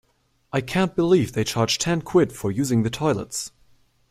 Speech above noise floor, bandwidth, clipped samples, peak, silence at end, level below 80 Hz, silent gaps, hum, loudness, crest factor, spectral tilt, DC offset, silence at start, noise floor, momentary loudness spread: 42 dB; 15.5 kHz; under 0.1%; -6 dBFS; 0.6 s; -52 dBFS; none; none; -22 LUFS; 18 dB; -5 dB/octave; under 0.1%; 0.55 s; -64 dBFS; 9 LU